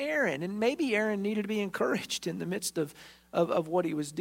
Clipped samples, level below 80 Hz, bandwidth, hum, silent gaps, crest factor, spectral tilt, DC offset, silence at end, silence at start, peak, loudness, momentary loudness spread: under 0.1%; -70 dBFS; 16 kHz; none; none; 16 dB; -4.5 dB/octave; under 0.1%; 0 s; 0 s; -14 dBFS; -31 LUFS; 6 LU